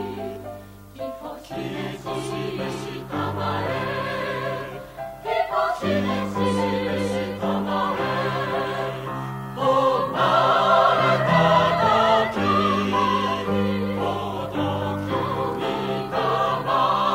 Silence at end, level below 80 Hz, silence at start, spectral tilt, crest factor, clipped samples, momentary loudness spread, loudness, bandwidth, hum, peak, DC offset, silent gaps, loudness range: 0 s; -52 dBFS; 0 s; -6 dB/octave; 18 dB; under 0.1%; 14 LU; -23 LUFS; 16 kHz; none; -4 dBFS; under 0.1%; none; 9 LU